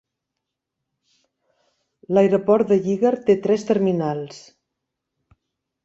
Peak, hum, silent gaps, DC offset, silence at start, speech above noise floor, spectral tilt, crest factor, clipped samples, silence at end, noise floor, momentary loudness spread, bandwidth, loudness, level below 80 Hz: -4 dBFS; none; none; under 0.1%; 2.1 s; 63 dB; -7.5 dB/octave; 18 dB; under 0.1%; 1.45 s; -82 dBFS; 8 LU; 7.8 kHz; -19 LUFS; -64 dBFS